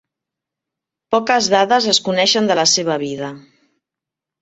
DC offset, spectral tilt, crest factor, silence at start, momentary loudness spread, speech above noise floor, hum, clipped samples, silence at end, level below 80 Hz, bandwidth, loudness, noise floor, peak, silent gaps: under 0.1%; -2.5 dB/octave; 18 dB; 1.1 s; 10 LU; 69 dB; none; under 0.1%; 1 s; -62 dBFS; 8.2 kHz; -15 LUFS; -85 dBFS; -2 dBFS; none